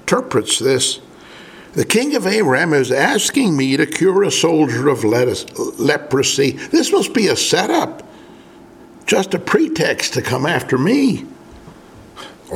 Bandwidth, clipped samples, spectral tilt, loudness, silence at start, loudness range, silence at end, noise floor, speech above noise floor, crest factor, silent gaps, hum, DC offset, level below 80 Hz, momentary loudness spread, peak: 17 kHz; under 0.1%; -4 dB/octave; -16 LUFS; 0.05 s; 3 LU; 0 s; -41 dBFS; 26 dB; 16 dB; none; none; under 0.1%; -54 dBFS; 10 LU; 0 dBFS